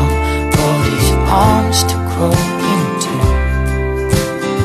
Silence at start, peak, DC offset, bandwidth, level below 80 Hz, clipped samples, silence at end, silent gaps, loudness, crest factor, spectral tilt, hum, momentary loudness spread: 0 s; 0 dBFS; under 0.1%; 14 kHz; -20 dBFS; under 0.1%; 0 s; none; -14 LUFS; 14 dB; -5 dB/octave; none; 5 LU